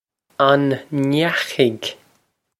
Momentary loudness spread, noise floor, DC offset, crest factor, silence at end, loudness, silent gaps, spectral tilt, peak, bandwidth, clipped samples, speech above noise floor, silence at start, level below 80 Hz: 13 LU; -64 dBFS; under 0.1%; 18 dB; 0.65 s; -19 LUFS; none; -5.5 dB/octave; 0 dBFS; 15 kHz; under 0.1%; 46 dB; 0.4 s; -64 dBFS